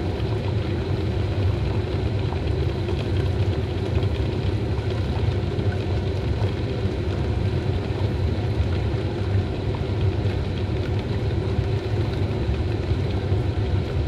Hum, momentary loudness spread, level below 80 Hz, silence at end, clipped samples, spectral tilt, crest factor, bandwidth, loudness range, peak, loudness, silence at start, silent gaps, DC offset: none; 2 LU; -32 dBFS; 0 s; under 0.1%; -8 dB/octave; 14 dB; 8.2 kHz; 0 LU; -10 dBFS; -25 LUFS; 0 s; none; under 0.1%